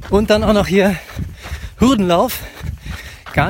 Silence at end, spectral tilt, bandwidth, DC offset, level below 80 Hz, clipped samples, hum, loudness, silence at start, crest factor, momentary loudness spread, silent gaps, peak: 0 s; -6 dB/octave; 16.5 kHz; under 0.1%; -30 dBFS; under 0.1%; none; -15 LUFS; 0 s; 16 dB; 17 LU; none; 0 dBFS